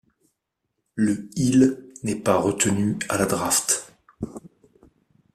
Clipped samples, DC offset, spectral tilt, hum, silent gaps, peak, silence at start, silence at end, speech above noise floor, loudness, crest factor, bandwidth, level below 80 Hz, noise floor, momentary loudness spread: under 0.1%; under 0.1%; -4.5 dB/octave; none; none; -6 dBFS; 0.95 s; 0.85 s; 57 dB; -22 LUFS; 20 dB; 15 kHz; -56 dBFS; -78 dBFS; 17 LU